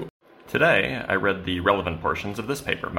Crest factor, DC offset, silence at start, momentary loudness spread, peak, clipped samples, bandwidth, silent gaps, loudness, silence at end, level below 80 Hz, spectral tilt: 20 dB; under 0.1%; 0 s; 10 LU; -4 dBFS; under 0.1%; 16.5 kHz; 0.10-0.20 s; -24 LUFS; 0 s; -48 dBFS; -5 dB/octave